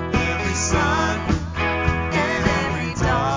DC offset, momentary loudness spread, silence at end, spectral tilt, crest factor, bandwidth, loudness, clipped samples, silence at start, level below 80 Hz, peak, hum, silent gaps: under 0.1%; 4 LU; 0 s; -4.5 dB/octave; 16 dB; 7.6 kHz; -21 LUFS; under 0.1%; 0 s; -30 dBFS; -4 dBFS; none; none